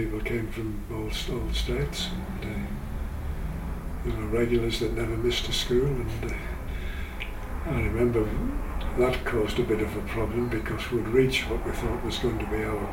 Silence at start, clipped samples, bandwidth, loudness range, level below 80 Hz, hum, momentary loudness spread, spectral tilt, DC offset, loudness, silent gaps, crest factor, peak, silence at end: 0 s; under 0.1%; 17 kHz; 5 LU; -34 dBFS; none; 10 LU; -5.5 dB/octave; under 0.1%; -29 LUFS; none; 18 dB; -10 dBFS; 0 s